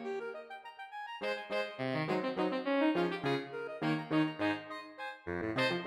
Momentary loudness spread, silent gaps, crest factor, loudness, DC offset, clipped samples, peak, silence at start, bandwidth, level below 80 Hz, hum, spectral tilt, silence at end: 13 LU; none; 18 dB; -35 LUFS; under 0.1%; under 0.1%; -18 dBFS; 0 s; 12.5 kHz; -74 dBFS; none; -6.5 dB/octave; 0 s